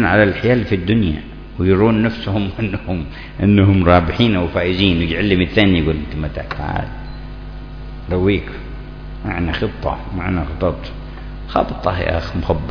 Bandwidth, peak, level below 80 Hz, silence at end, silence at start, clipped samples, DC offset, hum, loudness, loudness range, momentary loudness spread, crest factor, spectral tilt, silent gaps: 5.4 kHz; 0 dBFS; -30 dBFS; 0 s; 0 s; under 0.1%; under 0.1%; none; -17 LUFS; 8 LU; 19 LU; 18 dB; -8.5 dB/octave; none